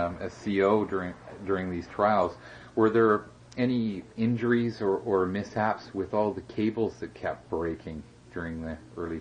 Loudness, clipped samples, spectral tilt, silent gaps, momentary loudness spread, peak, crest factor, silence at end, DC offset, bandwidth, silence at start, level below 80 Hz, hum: -29 LUFS; under 0.1%; -7.5 dB/octave; none; 14 LU; -10 dBFS; 18 dB; 0 s; under 0.1%; 9.6 kHz; 0 s; -58 dBFS; none